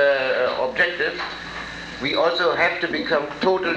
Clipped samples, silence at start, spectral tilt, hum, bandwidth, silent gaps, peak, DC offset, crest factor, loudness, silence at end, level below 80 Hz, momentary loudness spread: under 0.1%; 0 s; -4.5 dB/octave; none; 8.8 kHz; none; -6 dBFS; under 0.1%; 16 dB; -21 LUFS; 0 s; -52 dBFS; 12 LU